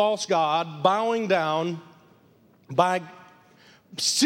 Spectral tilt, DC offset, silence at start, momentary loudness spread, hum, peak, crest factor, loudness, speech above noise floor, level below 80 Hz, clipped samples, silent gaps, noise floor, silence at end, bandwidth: -3 dB/octave; under 0.1%; 0 s; 11 LU; none; -4 dBFS; 22 dB; -24 LUFS; 34 dB; -78 dBFS; under 0.1%; none; -58 dBFS; 0 s; 16.5 kHz